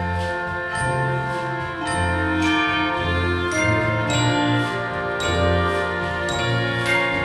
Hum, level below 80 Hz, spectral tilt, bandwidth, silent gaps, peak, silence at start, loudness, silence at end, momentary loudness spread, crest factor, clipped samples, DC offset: none; -40 dBFS; -5 dB/octave; 12.5 kHz; none; -8 dBFS; 0 s; -21 LUFS; 0 s; 6 LU; 14 dB; under 0.1%; under 0.1%